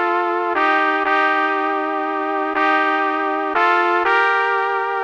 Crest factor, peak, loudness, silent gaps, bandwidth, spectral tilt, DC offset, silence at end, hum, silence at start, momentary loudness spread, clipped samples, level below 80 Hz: 14 dB; -4 dBFS; -17 LUFS; none; 8.8 kHz; -3 dB/octave; under 0.1%; 0 s; 50 Hz at -70 dBFS; 0 s; 5 LU; under 0.1%; -62 dBFS